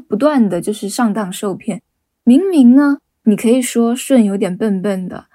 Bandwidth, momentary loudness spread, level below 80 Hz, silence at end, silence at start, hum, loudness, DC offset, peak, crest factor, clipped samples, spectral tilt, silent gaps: 16 kHz; 12 LU; -62 dBFS; 0.15 s; 0.1 s; none; -14 LUFS; under 0.1%; 0 dBFS; 14 dB; under 0.1%; -6 dB/octave; none